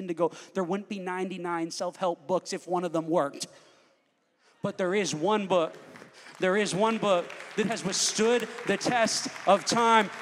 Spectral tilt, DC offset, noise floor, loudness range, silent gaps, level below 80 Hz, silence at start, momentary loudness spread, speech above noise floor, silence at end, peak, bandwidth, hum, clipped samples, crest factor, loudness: -3.5 dB/octave; under 0.1%; -70 dBFS; 5 LU; none; -76 dBFS; 0 s; 10 LU; 43 dB; 0 s; -6 dBFS; 15.5 kHz; none; under 0.1%; 22 dB; -28 LUFS